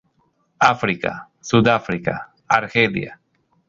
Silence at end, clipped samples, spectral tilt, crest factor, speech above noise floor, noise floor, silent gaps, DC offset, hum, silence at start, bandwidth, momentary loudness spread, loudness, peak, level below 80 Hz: 0.55 s; under 0.1%; -5.5 dB/octave; 20 dB; 45 dB; -64 dBFS; none; under 0.1%; none; 0.6 s; 7.6 kHz; 13 LU; -19 LUFS; -2 dBFS; -52 dBFS